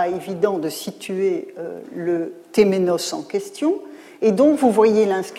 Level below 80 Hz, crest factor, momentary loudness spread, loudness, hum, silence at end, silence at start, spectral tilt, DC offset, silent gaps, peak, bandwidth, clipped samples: -62 dBFS; 16 dB; 13 LU; -20 LUFS; none; 0 s; 0 s; -5.5 dB/octave; under 0.1%; none; -4 dBFS; 15 kHz; under 0.1%